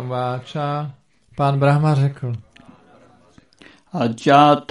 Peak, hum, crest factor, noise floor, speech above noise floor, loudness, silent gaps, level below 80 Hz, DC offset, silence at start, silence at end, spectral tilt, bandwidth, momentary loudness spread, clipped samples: 0 dBFS; none; 20 dB; -52 dBFS; 35 dB; -18 LUFS; none; -58 dBFS; under 0.1%; 0 s; 0.1 s; -7.5 dB/octave; 10.5 kHz; 19 LU; under 0.1%